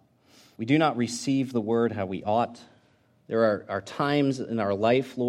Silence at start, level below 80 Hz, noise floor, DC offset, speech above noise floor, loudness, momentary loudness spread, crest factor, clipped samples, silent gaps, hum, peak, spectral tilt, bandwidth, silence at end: 0.6 s; -70 dBFS; -63 dBFS; under 0.1%; 38 dB; -26 LUFS; 8 LU; 18 dB; under 0.1%; none; none; -10 dBFS; -6 dB/octave; 13.5 kHz; 0 s